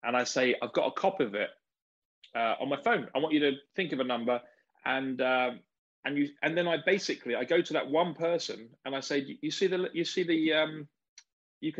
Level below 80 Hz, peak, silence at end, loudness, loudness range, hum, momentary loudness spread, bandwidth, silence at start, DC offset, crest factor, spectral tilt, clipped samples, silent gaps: -80 dBFS; -12 dBFS; 0 s; -30 LUFS; 1 LU; none; 9 LU; 8.2 kHz; 0.05 s; under 0.1%; 18 dB; -4 dB/octave; under 0.1%; 1.82-2.22 s, 5.78-6.03 s, 11.09-11.17 s, 11.32-11.61 s